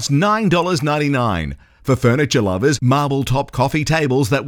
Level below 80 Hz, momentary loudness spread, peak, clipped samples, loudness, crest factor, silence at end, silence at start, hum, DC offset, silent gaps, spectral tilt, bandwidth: -40 dBFS; 5 LU; -4 dBFS; under 0.1%; -17 LUFS; 14 dB; 0 s; 0 s; none; under 0.1%; none; -5.5 dB/octave; 17.5 kHz